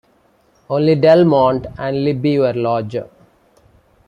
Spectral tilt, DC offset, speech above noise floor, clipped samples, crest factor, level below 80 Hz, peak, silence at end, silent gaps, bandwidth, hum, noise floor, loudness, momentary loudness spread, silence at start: -9 dB/octave; under 0.1%; 41 dB; under 0.1%; 16 dB; -50 dBFS; -2 dBFS; 1.05 s; none; 9.8 kHz; none; -56 dBFS; -15 LUFS; 12 LU; 0.7 s